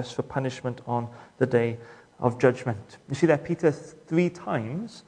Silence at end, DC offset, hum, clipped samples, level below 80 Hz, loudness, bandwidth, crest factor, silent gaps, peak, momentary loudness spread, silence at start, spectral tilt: 0.1 s; under 0.1%; none; under 0.1%; -64 dBFS; -27 LUFS; 10 kHz; 22 dB; none; -4 dBFS; 12 LU; 0 s; -7 dB/octave